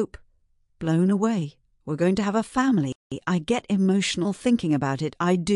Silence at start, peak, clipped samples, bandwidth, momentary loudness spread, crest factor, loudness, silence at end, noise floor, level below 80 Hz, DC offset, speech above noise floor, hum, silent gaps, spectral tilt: 0 s; -10 dBFS; under 0.1%; 11.5 kHz; 10 LU; 14 dB; -24 LUFS; 0 s; -64 dBFS; -56 dBFS; under 0.1%; 41 dB; none; 2.95-3.10 s; -6 dB/octave